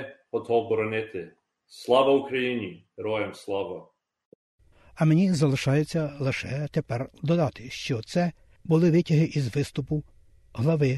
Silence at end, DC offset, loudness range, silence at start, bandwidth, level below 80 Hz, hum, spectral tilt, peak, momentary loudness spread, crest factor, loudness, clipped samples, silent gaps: 0 s; under 0.1%; 2 LU; 0 s; 12 kHz; -56 dBFS; none; -7 dB/octave; -8 dBFS; 14 LU; 18 dB; -26 LUFS; under 0.1%; 4.25-4.58 s